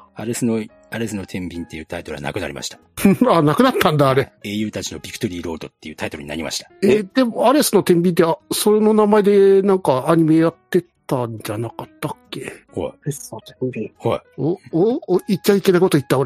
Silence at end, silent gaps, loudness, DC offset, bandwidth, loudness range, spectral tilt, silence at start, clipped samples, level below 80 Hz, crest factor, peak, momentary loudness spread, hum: 0 s; none; -18 LUFS; under 0.1%; 15.5 kHz; 11 LU; -5.5 dB/octave; 0.15 s; under 0.1%; -52 dBFS; 18 dB; 0 dBFS; 16 LU; none